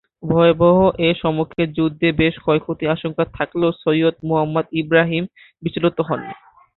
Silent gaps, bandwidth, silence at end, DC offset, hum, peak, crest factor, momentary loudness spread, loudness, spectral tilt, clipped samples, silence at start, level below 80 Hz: none; 4.2 kHz; 0.4 s; under 0.1%; none; -2 dBFS; 16 dB; 10 LU; -18 LUFS; -11.5 dB/octave; under 0.1%; 0.2 s; -46 dBFS